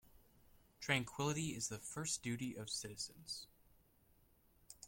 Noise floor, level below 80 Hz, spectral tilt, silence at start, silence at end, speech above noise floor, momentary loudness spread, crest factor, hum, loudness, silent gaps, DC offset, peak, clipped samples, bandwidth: -72 dBFS; -72 dBFS; -3 dB/octave; 0.05 s; 0 s; 29 dB; 10 LU; 24 dB; none; -42 LUFS; none; under 0.1%; -20 dBFS; under 0.1%; 16.5 kHz